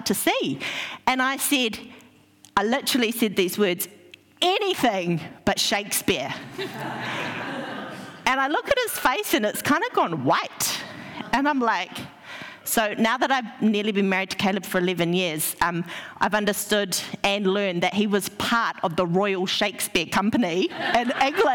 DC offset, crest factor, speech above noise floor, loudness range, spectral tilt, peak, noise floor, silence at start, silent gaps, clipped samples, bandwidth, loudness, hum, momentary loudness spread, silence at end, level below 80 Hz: under 0.1%; 14 dB; 30 dB; 2 LU; -3.5 dB/octave; -10 dBFS; -54 dBFS; 0 s; none; under 0.1%; 18.5 kHz; -23 LUFS; none; 9 LU; 0 s; -58 dBFS